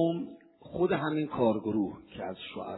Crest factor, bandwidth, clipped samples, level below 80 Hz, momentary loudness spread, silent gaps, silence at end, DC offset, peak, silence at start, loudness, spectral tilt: 18 dB; 4.1 kHz; under 0.1%; -64 dBFS; 12 LU; none; 0 s; under 0.1%; -14 dBFS; 0 s; -31 LUFS; -10.5 dB/octave